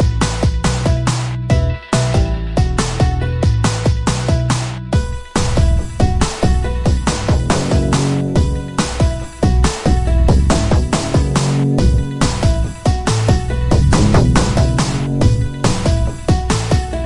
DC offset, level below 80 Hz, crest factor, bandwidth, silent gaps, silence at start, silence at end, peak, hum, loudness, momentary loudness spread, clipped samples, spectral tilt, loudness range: under 0.1%; -20 dBFS; 14 dB; 11.5 kHz; none; 0 s; 0 s; 0 dBFS; none; -16 LUFS; 5 LU; under 0.1%; -6 dB/octave; 2 LU